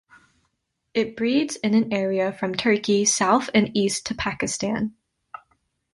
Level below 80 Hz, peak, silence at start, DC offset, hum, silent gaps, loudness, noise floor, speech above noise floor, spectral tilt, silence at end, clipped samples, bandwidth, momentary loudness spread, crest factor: -56 dBFS; -6 dBFS; 0.95 s; under 0.1%; none; none; -22 LUFS; -74 dBFS; 52 dB; -3.5 dB/octave; 1 s; under 0.1%; 11.5 kHz; 7 LU; 18 dB